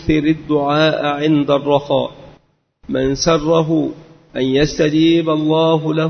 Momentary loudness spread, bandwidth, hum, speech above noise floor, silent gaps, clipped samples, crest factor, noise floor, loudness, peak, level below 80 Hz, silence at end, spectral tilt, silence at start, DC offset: 6 LU; 6.6 kHz; none; 39 dB; none; under 0.1%; 16 dB; -54 dBFS; -16 LUFS; 0 dBFS; -40 dBFS; 0 s; -6 dB/octave; 0 s; under 0.1%